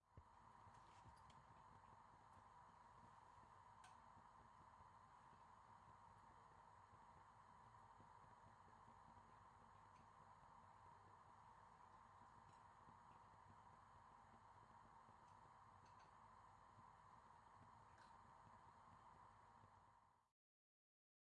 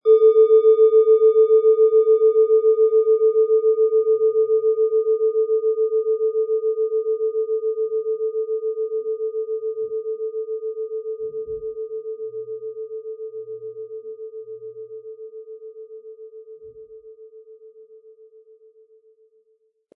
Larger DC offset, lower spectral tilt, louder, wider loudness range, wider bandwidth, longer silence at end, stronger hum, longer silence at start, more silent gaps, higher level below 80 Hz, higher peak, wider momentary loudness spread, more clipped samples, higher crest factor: neither; second, -5 dB/octave vs -9.5 dB/octave; second, -68 LUFS vs -19 LUFS; second, 0 LU vs 22 LU; first, 8.8 kHz vs 3.7 kHz; second, 1 s vs 2.25 s; neither; about the same, 0 s vs 0.05 s; neither; second, -84 dBFS vs -70 dBFS; second, -52 dBFS vs -6 dBFS; second, 1 LU vs 22 LU; neither; about the same, 16 dB vs 14 dB